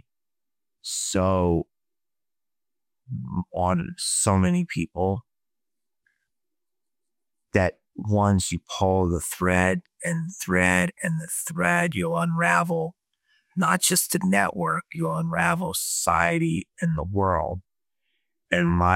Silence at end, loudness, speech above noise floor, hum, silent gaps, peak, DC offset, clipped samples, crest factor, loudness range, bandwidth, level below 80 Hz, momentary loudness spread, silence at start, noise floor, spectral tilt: 0 s; -24 LUFS; over 67 dB; none; none; -4 dBFS; under 0.1%; under 0.1%; 20 dB; 6 LU; 17 kHz; -48 dBFS; 9 LU; 0.85 s; under -90 dBFS; -4.5 dB/octave